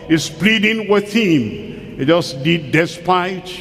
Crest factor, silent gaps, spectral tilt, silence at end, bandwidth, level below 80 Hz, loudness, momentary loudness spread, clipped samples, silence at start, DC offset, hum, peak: 16 dB; none; -5 dB/octave; 0 s; 15.5 kHz; -48 dBFS; -16 LUFS; 9 LU; under 0.1%; 0 s; under 0.1%; none; 0 dBFS